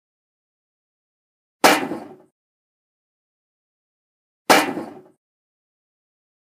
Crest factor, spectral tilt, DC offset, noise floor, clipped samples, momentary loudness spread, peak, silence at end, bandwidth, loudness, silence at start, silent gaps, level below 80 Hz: 26 dB; -2 dB/octave; under 0.1%; under -90 dBFS; under 0.1%; 18 LU; 0 dBFS; 1.45 s; 15.5 kHz; -18 LUFS; 1.65 s; 2.31-4.45 s; -70 dBFS